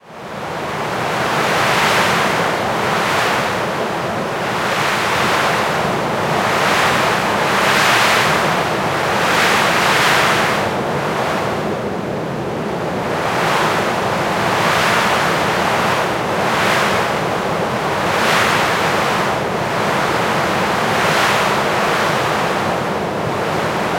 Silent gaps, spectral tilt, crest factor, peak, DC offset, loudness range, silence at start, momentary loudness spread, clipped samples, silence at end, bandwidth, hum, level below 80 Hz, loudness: none; -3.5 dB/octave; 16 dB; -2 dBFS; under 0.1%; 3 LU; 0.05 s; 7 LU; under 0.1%; 0 s; 16.5 kHz; none; -48 dBFS; -16 LUFS